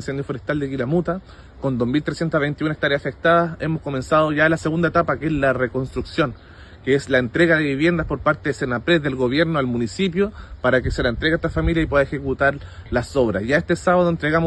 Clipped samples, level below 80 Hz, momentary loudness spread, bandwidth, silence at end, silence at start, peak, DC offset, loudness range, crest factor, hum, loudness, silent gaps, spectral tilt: under 0.1%; -38 dBFS; 8 LU; 9.6 kHz; 0 s; 0 s; -4 dBFS; under 0.1%; 2 LU; 18 dB; none; -20 LUFS; none; -6.5 dB/octave